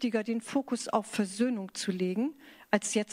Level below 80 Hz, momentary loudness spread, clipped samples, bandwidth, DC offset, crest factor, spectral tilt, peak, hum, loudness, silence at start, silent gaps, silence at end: -76 dBFS; 5 LU; under 0.1%; 15.5 kHz; under 0.1%; 22 dB; -4.5 dB/octave; -10 dBFS; none; -32 LUFS; 0 s; none; 0 s